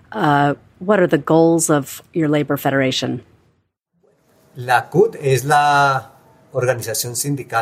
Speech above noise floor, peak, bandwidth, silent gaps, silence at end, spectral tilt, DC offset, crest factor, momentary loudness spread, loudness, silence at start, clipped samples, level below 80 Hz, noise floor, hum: 49 dB; -2 dBFS; 16 kHz; none; 0 s; -5 dB/octave; under 0.1%; 16 dB; 10 LU; -17 LUFS; 0.1 s; under 0.1%; -60 dBFS; -66 dBFS; none